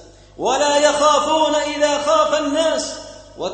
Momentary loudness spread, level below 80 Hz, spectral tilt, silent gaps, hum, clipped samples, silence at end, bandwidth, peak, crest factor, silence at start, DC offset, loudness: 13 LU; -50 dBFS; -2 dB/octave; none; 50 Hz at -50 dBFS; under 0.1%; 0 s; 8.8 kHz; -2 dBFS; 16 dB; 0 s; under 0.1%; -17 LUFS